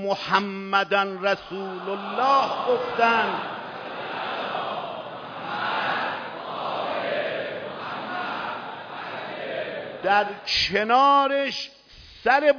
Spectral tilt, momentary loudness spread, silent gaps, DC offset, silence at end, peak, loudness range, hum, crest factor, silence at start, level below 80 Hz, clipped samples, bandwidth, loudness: -4 dB/octave; 13 LU; none; under 0.1%; 0 s; -6 dBFS; 7 LU; none; 20 dB; 0 s; -60 dBFS; under 0.1%; 5.4 kHz; -25 LUFS